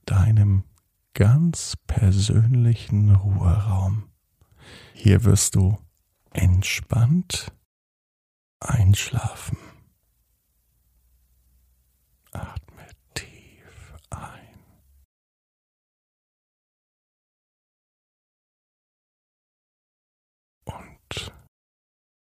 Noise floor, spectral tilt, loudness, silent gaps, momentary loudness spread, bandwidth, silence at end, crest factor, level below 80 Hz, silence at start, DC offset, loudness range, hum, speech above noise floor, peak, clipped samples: -68 dBFS; -5.5 dB/octave; -21 LUFS; 7.65-8.60 s, 15.05-20.61 s; 22 LU; 15 kHz; 1.05 s; 20 dB; -42 dBFS; 0.05 s; under 0.1%; 22 LU; none; 49 dB; -4 dBFS; under 0.1%